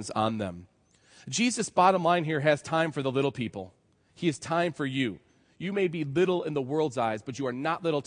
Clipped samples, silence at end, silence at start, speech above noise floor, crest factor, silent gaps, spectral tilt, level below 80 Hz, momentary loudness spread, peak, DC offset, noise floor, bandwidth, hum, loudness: under 0.1%; 0.05 s; 0 s; 32 dB; 20 dB; none; -5 dB/octave; -70 dBFS; 12 LU; -8 dBFS; under 0.1%; -60 dBFS; 10.5 kHz; none; -28 LUFS